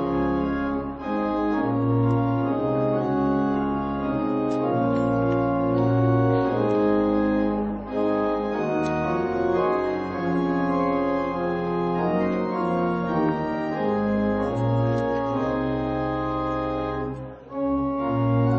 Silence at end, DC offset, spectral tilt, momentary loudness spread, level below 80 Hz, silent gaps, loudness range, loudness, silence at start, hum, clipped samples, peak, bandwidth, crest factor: 0 s; under 0.1%; -9 dB/octave; 5 LU; -44 dBFS; none; 3 LU; -24 LUFS; 0 s; none; under 0.1%; -10 dBFS; 6.8 kHz; 14 dB